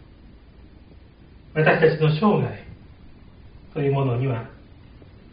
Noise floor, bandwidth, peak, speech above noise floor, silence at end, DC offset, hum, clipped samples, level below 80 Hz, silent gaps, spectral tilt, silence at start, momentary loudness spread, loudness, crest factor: -48 dBFS; 5.2 kHz; -4 dBFS; 28 dB; 0.8 s; under 0.1%; none; under 0.1%; -50 dBFS; none; -6 dB/octave; 1.55 s; 16 LU; -21 LUFS; 20 dB